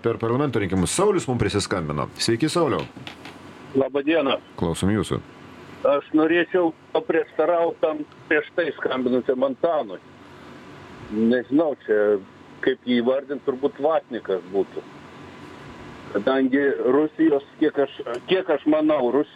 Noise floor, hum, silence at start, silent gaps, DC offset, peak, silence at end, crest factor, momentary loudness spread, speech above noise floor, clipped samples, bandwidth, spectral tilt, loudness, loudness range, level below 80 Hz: -44 dBFS; none; 0.05 s; none; under 0.1%; -6 dBFS; 0.1 s; 16 dB; 20 LU; 22 dB; under 0.1%; 13.5 kHz; -5.5 dB/octave; -23 LUFS; 3 LU; -54 dBFS